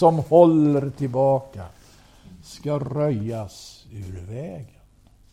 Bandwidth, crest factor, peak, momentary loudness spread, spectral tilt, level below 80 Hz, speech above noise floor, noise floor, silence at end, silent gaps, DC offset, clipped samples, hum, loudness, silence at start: 12 kHz; 20 dB; -2 dBFS; 25 LU; -8.5 dB/octave; -52 dBFS; 33 dB; -54 dBFS; 0.65 s; none; under 0.1%; under 0.1%; none; -20 LUFS; 0 s